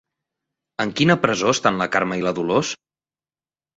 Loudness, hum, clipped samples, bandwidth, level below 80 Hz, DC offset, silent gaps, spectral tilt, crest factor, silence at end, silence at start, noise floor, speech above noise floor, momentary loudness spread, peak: -20 LUFS; none; under 0.1%; 8 kHz; -58 dBFS; under 0.1%; none; -4.5 dB/octave; 20 dB; 1 s; 0.8 s; under -90 dBFS; over 70 dB; 11 LU; -2 dBFS